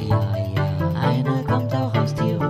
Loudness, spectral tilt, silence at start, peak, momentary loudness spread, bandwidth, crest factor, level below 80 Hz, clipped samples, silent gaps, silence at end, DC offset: -22 LUFS; -8 dB/octave; 0 s; -6 dBFS; 2 LU; 14 kHz; 14 dB; -44 dBFS; under 0.1%; none; 0 s; under 0.1%